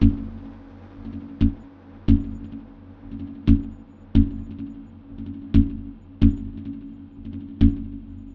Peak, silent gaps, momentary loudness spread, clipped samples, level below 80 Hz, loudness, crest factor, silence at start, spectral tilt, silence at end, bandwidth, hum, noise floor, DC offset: -2 dBFS; none; 20 LU; under 0.1%; -30 dBFS; -24 LUFS; 20 dB; 0 s; -10.5 dB/octave; 0 s; 4.8 kHz; none; -44 dBFS; under 0.1%